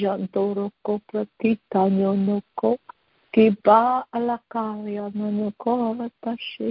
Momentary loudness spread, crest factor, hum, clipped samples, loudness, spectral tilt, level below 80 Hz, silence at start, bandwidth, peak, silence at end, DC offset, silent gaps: 12 LU; 20 dB; none; under 0.1%; -23 LUFS; -11.5 dB/octave; -64 dBFS; 0 s; 5.4 kHz; -4 dBFS; 0 s; under 0.1%; none